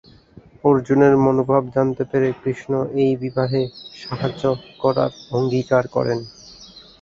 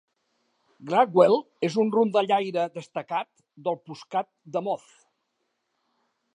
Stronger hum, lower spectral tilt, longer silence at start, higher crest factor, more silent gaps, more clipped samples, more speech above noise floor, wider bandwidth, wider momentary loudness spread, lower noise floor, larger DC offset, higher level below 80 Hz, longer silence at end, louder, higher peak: neither; first, -8 dB/octave vs -6.5 dB/octave; second, 0.65 s vs 0.8 s; about the same, 18 dB vs 22 dB; neither; neither; second, 28 dB vs 53 dB; second, 7.4 kHz vs 10.5 kHz; about the same, 13 LU vs 14 LU; second, -47 dBFS vs -77 dBFS; neither; first, -52 dBFS vs -82 dBFS; second, 0.2 s vs 1.6 s; first, -20 LUFS vs -25 LUFS; about the same, -2 dBFS vs -4 dBFS